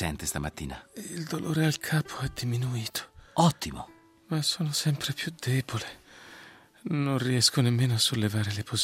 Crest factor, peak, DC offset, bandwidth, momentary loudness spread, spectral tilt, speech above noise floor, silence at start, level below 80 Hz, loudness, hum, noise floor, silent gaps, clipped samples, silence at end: 20 dB; -10 dBFS; under 0.1%; 16 kHz; 17 LU; -4.5 dB/octave; 24 dB; 0 s; -54 dBFS; -28 LUFS; none; -52 dBFS; none; under 0.1%; 0 s